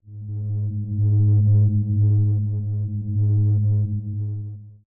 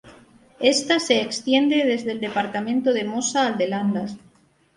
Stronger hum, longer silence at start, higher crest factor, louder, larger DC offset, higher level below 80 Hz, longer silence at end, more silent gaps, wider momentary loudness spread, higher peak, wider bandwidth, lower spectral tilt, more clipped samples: neither; about the same, 0.05 s vs 0.05 s; second, 10 dB vs 18 dB; about the same, -21 LUFS vs -21 LUFS; neither; first, -48 dBFS vs -66 dBFS; second, 0.15 s vs 0.6 s; neither; first, 12 LU vs 7 LU; second, -10 dBFS vs -4 dBFS; second, 0.9 kHz vs 11.5 kHz; first, -17.5 dB/octave vs -3.5 dB/octave; neither